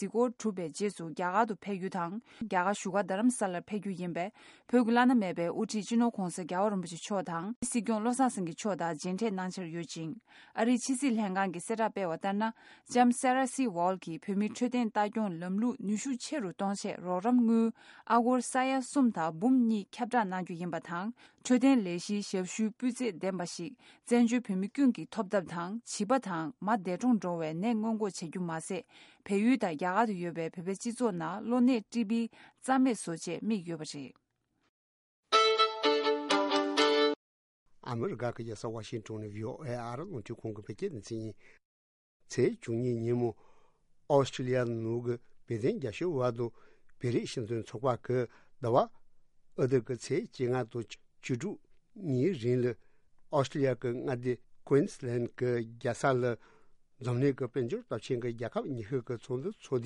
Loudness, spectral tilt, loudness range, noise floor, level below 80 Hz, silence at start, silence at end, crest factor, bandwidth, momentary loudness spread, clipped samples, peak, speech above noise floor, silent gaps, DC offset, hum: -32 LUFS; -5.5 dB/octave; 5 LU; -63 dBFS; -70 dBFS; 0 s; 0 s; 20 dB; 11.5 kHz; 12 LU; under 0.1%; -12 dBFS; 31 dB; 7.56-7.62 s, 34.69-35.23 s, 37.16-37.66 s, 41.65-42.20 s; under 0.1%; none